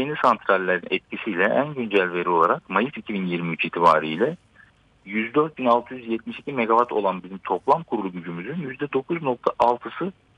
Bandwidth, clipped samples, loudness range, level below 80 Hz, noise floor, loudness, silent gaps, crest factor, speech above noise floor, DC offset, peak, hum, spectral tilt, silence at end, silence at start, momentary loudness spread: 9.8 kHz; under 0.1%; 3 LU; -64 dBFS; -55 dBFS; -23 LUFS; none; 18 dB; 32 dB; under 0.1%; -6 dBFS; none; -7 dB/octave; 0.25 s; 0 s; 11 LU